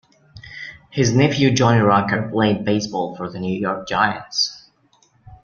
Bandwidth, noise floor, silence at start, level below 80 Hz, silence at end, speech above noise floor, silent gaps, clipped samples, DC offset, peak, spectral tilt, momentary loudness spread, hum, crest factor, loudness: 7.4 kHz; -59 dBFS; 0.35 s; -52 dBFS; 0.1 s; 40 dB; none; under 0.1%; under 0.1%; -2 dBFS; -5 dB/octave; 13 LU; none; 18 dB; -19 LUFS